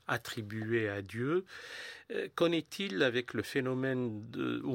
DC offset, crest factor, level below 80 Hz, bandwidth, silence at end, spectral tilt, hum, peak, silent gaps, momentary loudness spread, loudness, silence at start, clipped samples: under 0.1%; 20 dB; -74 dBFS; 16.5 kHz; 0 s; -5.5 dB/octave; none; -16 dBFS; none; 9 LU; -35 LUFS; 0.1 s; under 0.1%